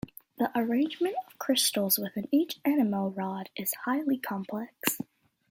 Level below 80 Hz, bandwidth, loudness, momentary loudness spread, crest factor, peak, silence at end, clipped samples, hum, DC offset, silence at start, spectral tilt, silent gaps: -70 dBFS; 17 kHz; -29 LUFS; 10 LU; 22 dB; -8 dBFS; 0.45 s; under 0.1%; none; under 0.1%; 0.05 s; -3.5 dB/octave; none